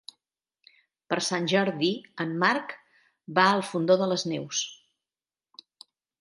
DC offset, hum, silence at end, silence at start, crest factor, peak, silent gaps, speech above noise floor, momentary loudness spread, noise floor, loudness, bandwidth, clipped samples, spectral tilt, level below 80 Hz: under 0.1%; none; 1.45 s; 1.1 s; 22 dB; -6 dBFS; none; over 64 dB; 10 LU; under -90 dBFS; -26 LUFS; 11.5 kHz; under 0.1%; -4 dB/octave; -78 dBFS